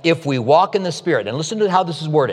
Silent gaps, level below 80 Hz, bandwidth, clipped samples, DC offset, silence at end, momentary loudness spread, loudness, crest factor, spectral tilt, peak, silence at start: none; -68 dBFS; 11.5 kHz; under 0.1%; under 0.1%; 0 s; 6 LU; -18 LUFS; 16 dB; -5.5 dB/octave; -2 dBFS; 0.05 s